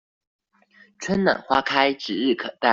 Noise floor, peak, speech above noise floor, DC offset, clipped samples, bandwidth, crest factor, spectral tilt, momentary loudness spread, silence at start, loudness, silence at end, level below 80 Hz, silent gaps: -56 dBFS; -2 dBFS; 35 dB; under 0.1%; under 0.1%; 7.8 kHz; 20 dB; -4.5 dB/octave; 5 LU; 1 s; -22 LUFS; 0 s; -58 dBFS; none